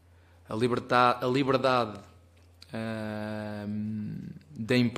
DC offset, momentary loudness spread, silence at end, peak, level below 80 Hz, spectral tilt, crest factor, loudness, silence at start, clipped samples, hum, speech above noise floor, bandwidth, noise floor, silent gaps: under 0.1%; 17 LU; 0 s; -8 dBFS; -64 dBFS; -6.5 dB/octave; 22 dB; -29 LUFS; 0.5 s; under 0.1%; none; 29 dB; 15.5 kHz; -57 dBFS; none